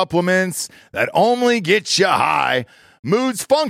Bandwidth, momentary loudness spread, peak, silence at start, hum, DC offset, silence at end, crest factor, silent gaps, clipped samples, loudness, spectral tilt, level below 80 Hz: 16 kHz; 8 LU; -4 dBFS; 0 s; none; under 0.1%; 0 s; 14 dB; 2.99-3.03 s; under 0.1%; -17 LUFS; -4 dB/octave; -60 dBFS